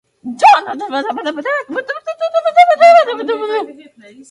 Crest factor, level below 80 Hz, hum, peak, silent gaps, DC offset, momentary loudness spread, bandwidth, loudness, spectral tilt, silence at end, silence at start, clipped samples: 14 dB; -70 dBFS; none; 0 dBFS; none; under 0.1%; 14 LU; 11 kHz; -13 LUFS; -2.5 dB/octave; 0.6 s; 0.25 s; under 0.1%